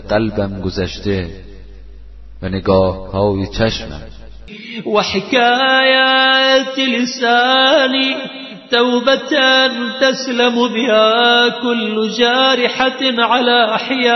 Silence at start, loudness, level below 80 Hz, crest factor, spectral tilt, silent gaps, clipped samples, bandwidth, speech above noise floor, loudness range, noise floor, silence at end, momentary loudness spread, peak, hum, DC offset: 0 s; -13 LUFS; -38 dBFS; 14 dB; -4 dB/octave; none; under 0.1%; 6.2 kHz; 22 dB; 8 LU; -36 dBFS; 0 s; 11 LU; 0 dBFS; none; under 0.1%